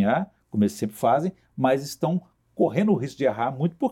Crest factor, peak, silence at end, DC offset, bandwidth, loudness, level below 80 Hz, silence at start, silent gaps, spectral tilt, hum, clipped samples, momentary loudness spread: 16 dB; -8 dBFS; 0 s; under 0.1%; 16.5 kHz; -25 LUFS; -64 dBFS; 0 s; none; -7 dB/octave; none; under 0.1%; 6 LU